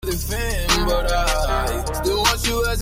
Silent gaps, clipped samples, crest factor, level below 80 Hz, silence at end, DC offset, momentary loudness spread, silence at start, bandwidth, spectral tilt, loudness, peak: none; under 0.1%; 16 dB; -24 dBFS; 0 s; under 0.1%; 6 LU; 0 s; 16.5 kHz; -3.5 dB/octave; -20 LUFS; -4 dBFS